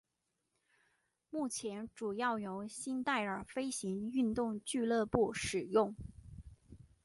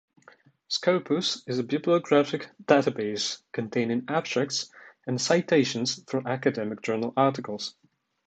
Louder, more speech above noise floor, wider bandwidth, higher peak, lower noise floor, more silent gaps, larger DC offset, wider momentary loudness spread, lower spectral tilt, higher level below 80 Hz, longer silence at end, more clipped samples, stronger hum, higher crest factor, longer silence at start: second, -37 LUFS vs -26 LUFS; first, 49 dB vs 31 dB; first, 11.5 kHz vs 9.2 kHz; second, -16 dBFS vs -6 dBFS; first, -85 dBFS vs -57 dBFS; neither; neither; about the same, 11 LU vs 11 LU; about the same, -4.5 dB/octave vs -4.5 dB/octave; first, -62 dBFS vs -72 dBFS; second, 0.25 s vs 0.55 s; neither; neither; about the same, 24 dB vs 22 dB; first, 1.35 s vs 0.7 s